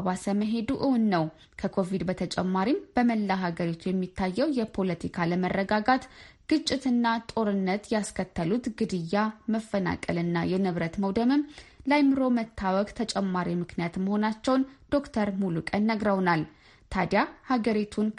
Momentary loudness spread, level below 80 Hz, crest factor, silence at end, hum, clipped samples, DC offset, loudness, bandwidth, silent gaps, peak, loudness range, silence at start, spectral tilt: 6 LU; -54 dBFS; 18 dB; 0 s; none; under 0.1%; under 0.1%; -28 LUFS; 11.5 kHz; none; -8 dBFS; 2 LU; 0 s; -6.5 dB/octave